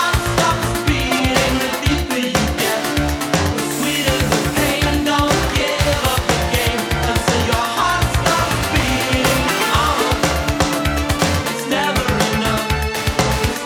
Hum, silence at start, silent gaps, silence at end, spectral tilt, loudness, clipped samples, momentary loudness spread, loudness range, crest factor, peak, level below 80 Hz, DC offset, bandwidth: none; 0 s; none; 0 s; -4 dB/octave; -17 LUFS; under 0.1%; 3 LU; 1 LU; 16 dB; 0 dBFS; -26 dBFS; under 0.1%; over 20 kHz